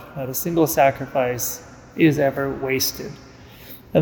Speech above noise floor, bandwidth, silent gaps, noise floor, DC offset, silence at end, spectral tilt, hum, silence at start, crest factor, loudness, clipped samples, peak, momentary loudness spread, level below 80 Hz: 21 dB; 19.5 kHz; none; -42 dBFS; under 0.1%; 0 s; -4.5 dB/octave; none; 0 s; 18 dB; -21 LUFS; under 0.1%; -4 dBFS; 19 LU; -50 dBFS